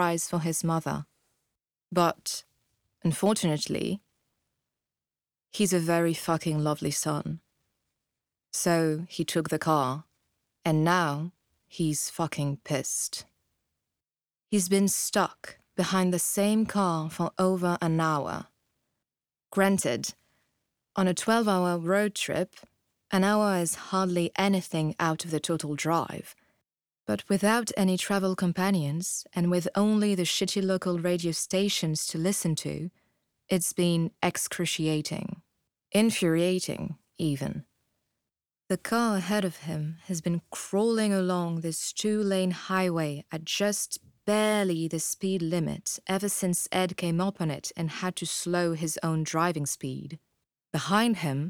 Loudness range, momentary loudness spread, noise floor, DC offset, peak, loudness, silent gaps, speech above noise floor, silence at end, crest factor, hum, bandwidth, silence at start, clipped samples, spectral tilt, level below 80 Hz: 3 LU; 10 LU; under -90 dBFS; under 0.1%; -8 dBFS; -28 LUFS; none; over 63 dB; 0 s; 20 dB; none; 18.5 kHz; 0 s; under 0.1%; -4.5 dB/octave; -66 dBFS